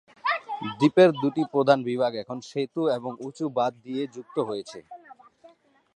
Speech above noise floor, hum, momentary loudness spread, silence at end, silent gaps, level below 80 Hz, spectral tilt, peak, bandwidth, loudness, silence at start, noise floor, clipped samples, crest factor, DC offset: 31 dB; none; 15 LU; 0.5 s; none; -76 dBFS; -6.5 dB/octave; -4 dBFS; 9.6 kHz; -25 LUFS; 0.25 s; -56 dBFS; under 0.1%; 22 dB; under 0.1%